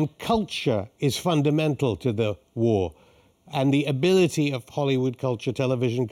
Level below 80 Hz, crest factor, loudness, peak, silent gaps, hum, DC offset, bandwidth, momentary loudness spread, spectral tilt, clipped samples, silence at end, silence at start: -56 dBFS; 14 dB; -24 LUFS; -10 dBFS; none; none; under 0.1%; 14.5 kHz; 6 LU; -6.5 dB/octave; under 0.1%; 0 s; 0 s